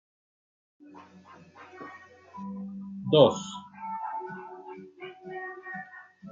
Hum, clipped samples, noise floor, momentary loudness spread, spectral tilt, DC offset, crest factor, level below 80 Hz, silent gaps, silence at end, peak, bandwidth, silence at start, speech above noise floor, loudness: none; under 0.1%; -50 dBFS; 28 LU; -5.5 dB/octave; under 0.1%; 26 dB; -76 dBFS; none; 0 s; -6 dBFS; 7.8 kHz; 0.8 s; 23 dB; -29 LUFS